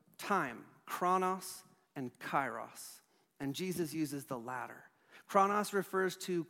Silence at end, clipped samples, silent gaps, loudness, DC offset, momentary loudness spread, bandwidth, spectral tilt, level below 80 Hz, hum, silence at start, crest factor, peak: 0 s; under 0.1%; none; -37 LUFS; under 0.1%; 17 LU; 16.5 kHz; -4.5 dB/octave; -80 dBFS; none; 0.2 s; 22 dB; -16 dBFS